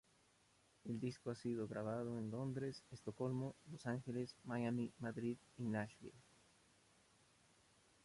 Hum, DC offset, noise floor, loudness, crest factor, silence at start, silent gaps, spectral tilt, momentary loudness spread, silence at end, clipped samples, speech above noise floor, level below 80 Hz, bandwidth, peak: none; under 0.1%; -75 dBFS; -46 LUFS; 18 dB; 0.85 s; none; -7 dB/octave; 7 LU; 1.85 s; under 0.1%; 29 dB; -78 dBFS; 11.5 kHz; -30 dBFS